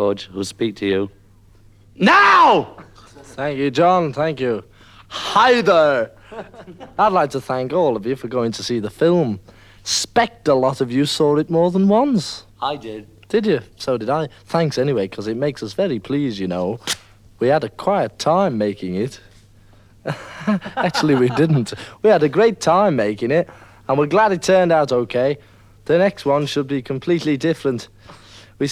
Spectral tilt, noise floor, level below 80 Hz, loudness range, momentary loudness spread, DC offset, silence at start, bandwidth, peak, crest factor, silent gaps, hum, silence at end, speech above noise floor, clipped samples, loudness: -5.5 dB/octave; -48 dBFS; -54 dBFS; 5 LU; 14 LU; under 0.1%; 0 s; 15 kHz; -2 dBFS; 18 dB; none; none; 0 s; 31 dB; under 0.1%; -18 LUFS